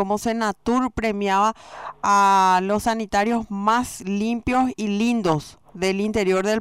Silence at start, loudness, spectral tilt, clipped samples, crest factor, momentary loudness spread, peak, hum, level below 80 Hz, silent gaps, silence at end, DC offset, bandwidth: 0 s; -21 LUFS; -5 dB/octave; under 0.1%; 14 dB; 9 LU; -6 dBFS; none; -48 dBFS; none; 0 s; 0.1%; 16 kHz